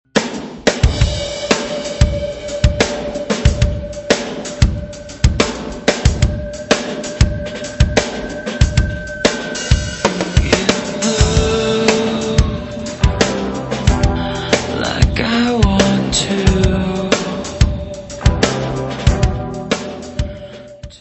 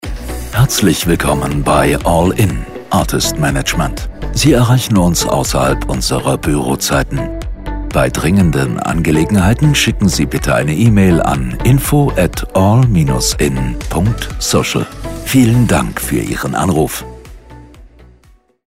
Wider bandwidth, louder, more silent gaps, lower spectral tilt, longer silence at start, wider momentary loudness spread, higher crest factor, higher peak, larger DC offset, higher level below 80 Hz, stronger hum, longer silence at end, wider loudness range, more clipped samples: second, 8.4 kHz vs 16.5 kHz; second, -17 LUFS vs -13 LUFS; neither; about the same, -5 dB/octave vs -5 dB/octave; about the same, 0.15 s vs 0.05 s; about the same, 10 LU vs 9 LU; about the same, 16 dB vs 12 dB; about the same, 0 dBFS vs 0 dBFS; neither; about the same, -22 dBFS vs -24 dBFS; neither; second, 0.05 s vs 0.65 s; about the same, 3 LU vs 3 LU; neither